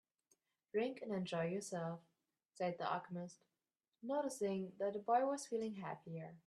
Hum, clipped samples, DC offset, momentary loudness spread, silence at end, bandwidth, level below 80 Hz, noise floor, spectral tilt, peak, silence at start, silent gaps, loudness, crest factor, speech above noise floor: none; under 0.1%; under 0.1%; 13 LU; 0.1 s; 13 kHz; -88 dBFS; under -90 dBFS; -5.5 dB/octave; -24 dBFS; 0.75 s; none; -42 LUFS; 20 dB; over 48 dB